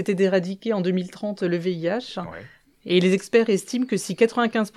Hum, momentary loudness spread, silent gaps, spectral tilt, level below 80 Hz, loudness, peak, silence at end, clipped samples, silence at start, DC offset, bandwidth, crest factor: none; 13 LU; none; -5.5 dB/octave; -68 dBFS; -23 LUFS; -6 dBFS; 0.1 s; under 0.1%; 0 s; under 0.1%; 13.5 kHz; 18 dB